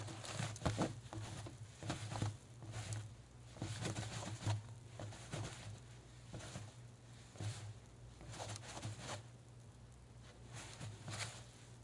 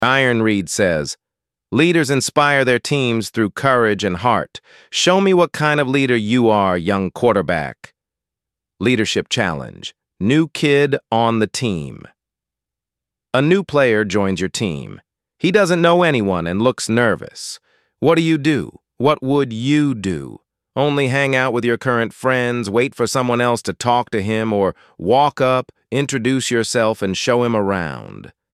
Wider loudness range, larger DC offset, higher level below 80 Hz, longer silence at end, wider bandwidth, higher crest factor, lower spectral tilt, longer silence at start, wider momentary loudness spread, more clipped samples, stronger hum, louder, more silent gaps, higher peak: first, 6 LU vs 3 LU; neither; second, -64 dBFS vs -52 dBFS; second, 0 s vs 0.25 s; second, 11.5 kHz vs 14 kHz; first, 24 dB vs 16 dB; about the same, -4.5 dB/octave vs -5 dB/octave; about the same, 0 s vs 0 s; first, 15 LU vs 10 LU; neither; neither; second, -48 LUFS vs -17 LUFS; neither; second, -24 dBFS vs 0 dBFS